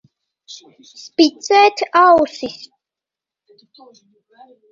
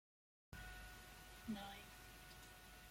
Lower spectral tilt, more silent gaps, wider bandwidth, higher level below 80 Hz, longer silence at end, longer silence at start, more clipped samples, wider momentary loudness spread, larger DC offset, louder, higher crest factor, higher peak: second, -2.5 dB/octave vs -4 dB/octave; neither; second, 7.8 kHz vs 16.5 kHz; about the same, -60 dBFS vs -64 dBFS; first, 2.2 s vs 0 s; about the same, 0.5 s vs 0.5 s; neither; first, 26 LU vs 9 LU; neither; first, -14 LUFS vs -56 LUFS; about the same, 18 dB vs 20 dB; first, 0 dBFS vs -36 dBFS